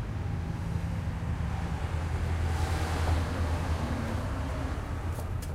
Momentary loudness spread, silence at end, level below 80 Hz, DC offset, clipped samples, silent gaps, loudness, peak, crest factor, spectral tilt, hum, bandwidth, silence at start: 5 LU; 0 s; -36 dBFS; under 0.1%; under 0.1%; none; -33 LUFS; -18 dBFS; 14 dB; -6.5 dB/octave; none; 14.5 kHz; 0 s